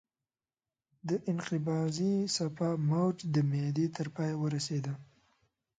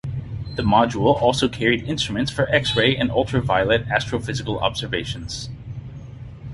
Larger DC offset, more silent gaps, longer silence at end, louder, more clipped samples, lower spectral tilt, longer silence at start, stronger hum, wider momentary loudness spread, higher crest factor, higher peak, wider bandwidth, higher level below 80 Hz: neither; neither; first, 0.75 s vs 0 s; second, -33 LUFS vs -21 LUFS; neither; about the same, -6 dB/octave vs -5 dB/octave; first, 1.05 s vs 0.05 s; neither; second, 6 LU vs 17 LU; about the same, 14 dB vs 18 dB; second, -20 dBFS vs -2 dBFS; second, 9.4 kHz vs 11.5 kHz; second, -72 dBFS vs -40 dBFS